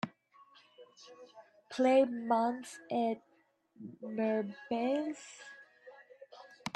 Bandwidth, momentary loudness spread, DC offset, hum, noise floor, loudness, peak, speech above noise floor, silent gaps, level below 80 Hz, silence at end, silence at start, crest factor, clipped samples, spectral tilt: 12 kHz; 26 LU; under 0.1%; none; -68 dBFS; -34 LUFS; -16 dBFS; 34 dB; none; -84 dBFS; 0.05 s; 0.05 s; 20 dB; under 0.1%; -5.5 dB/octave